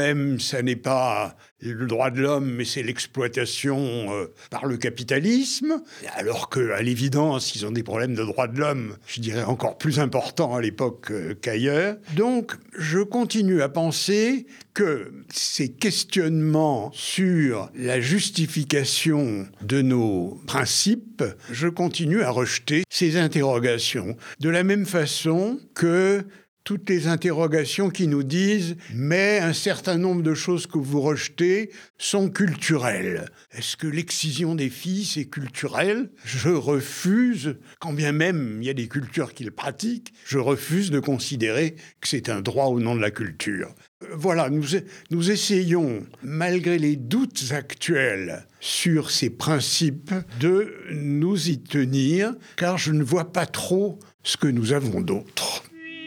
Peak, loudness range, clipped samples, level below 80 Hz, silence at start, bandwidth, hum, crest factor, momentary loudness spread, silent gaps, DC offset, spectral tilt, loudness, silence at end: -6 dBFS; 3 LU; under 0.1%; -68 dBFS; 0 s; 18 kHz; none; 18 dB; 9 LU; 1.51-1.56 s, 26.48-26.57 s, 31.90-31.94 s, 43.88-44.00 s, 54.14-54.19 s; under 0.1%; -5 dB/octave; -24 LUFS; 0 s